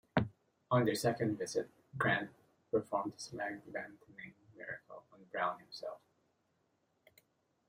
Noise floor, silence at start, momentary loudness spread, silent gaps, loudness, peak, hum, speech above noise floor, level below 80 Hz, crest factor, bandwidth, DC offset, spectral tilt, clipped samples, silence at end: -79 dBFS; 0.15 s; 19 LU; none; -38 LUFS; -16 dBFS; none; 41 dB; -72 dBFS; 24 dB; 16 kHz; under 0.1%; -5.5 dB/octave; under 0.1%; 1.7 s